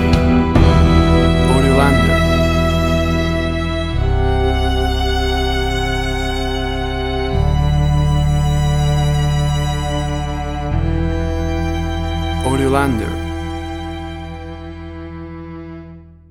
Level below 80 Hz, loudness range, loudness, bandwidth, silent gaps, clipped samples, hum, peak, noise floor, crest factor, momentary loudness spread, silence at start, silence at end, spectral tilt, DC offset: -20 dBFS; 7 LU; -17 LUFS; 14 kHz; none; under 0.1%; none; 0 dBFS; -37 dBFS; 16 dB; 17 LU; 0 s; 0.2 s; -6.5 dB/octave; under 0.1%